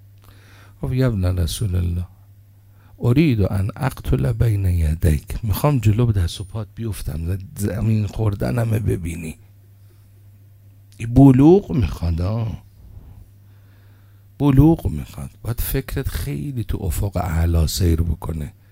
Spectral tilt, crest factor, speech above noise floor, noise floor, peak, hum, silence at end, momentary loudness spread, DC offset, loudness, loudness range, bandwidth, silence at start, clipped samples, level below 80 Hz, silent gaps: -7.5 dB/octave; 20 dB; 29 dB; -48 dBFS; 0 dBFS; none; 0.2 s; 15 LU; under 0.1%; -20 LUFS; 6 LU; 16 kHz; 0.8 s; under 0.1%; -30 dBFS; none